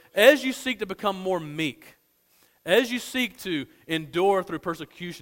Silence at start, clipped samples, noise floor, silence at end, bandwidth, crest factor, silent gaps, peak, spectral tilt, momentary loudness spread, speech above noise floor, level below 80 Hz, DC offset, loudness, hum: 0.15 s; under 0.1%; -63 dBFS; 0 s; 16.5 kHz; 22 dB; none; -4 dBFS; -4 dB/octave; 14 LU; 38 dB; -64 dBFS; under 0.1%; -25 LUFS; none